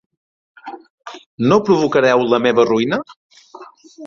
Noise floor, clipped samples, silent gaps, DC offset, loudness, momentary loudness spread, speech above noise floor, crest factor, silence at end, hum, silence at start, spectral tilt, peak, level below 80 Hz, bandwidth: -40 dBFS; under 0.1%; 0.90-0.98 s, 1.26-1.38 s, 3.16-3.30 s; under 0.1%; -15 LUFS; 23 LU; 26 dB; 16 dB; 0 s; none; 0.65 s; -6 dB/octave; -2 dBFS; -58 dBFS; 7.2 kHz